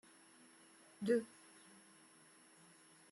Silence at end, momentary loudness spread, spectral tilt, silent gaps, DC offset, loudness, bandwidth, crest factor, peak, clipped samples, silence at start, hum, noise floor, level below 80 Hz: 1.85 s; 25 LU; -5.5 dB/octave; none; under 0.1%; -39 LUFS; 12 kHz; 22 dB; -24 dBFS; under 0.1%; 1 s; none; -66 dBFS; under -90 dBFS